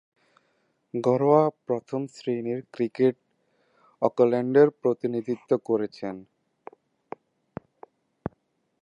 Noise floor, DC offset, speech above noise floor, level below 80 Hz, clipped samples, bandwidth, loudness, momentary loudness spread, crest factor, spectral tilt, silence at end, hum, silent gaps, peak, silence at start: -71 dBFS; under 0.1%; 47 dB; -68 dBFS; under 0.1%; 8.2 kHz; -25 LUFS; 24 LU; 22 dB; -8.5 dB/octave; 0.55 s; none; none; -6 dBFS; 0.95 s